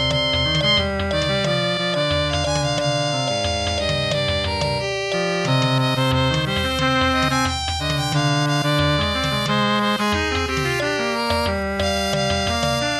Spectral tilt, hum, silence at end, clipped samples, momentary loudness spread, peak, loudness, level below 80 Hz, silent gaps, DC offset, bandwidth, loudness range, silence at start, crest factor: -4.5 dB/octave; none; 0 s; under 0.1%; 3 LU; -6 dBFS; -20 LUFS; -36 dBFS; none; under 0.1%; 14.5 kHz; 1 LU; 0 s; 14 dB